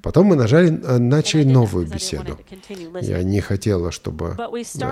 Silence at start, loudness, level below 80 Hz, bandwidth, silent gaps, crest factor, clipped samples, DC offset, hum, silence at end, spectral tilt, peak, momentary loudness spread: 0.05 s; -18 LUFS; -40 dBFS; 13.5 kHz; none; 14 dB; under 0.1%; under 0.1%; none; 0 s; -6.5 dB/octave; -4 dBFS; 16 LU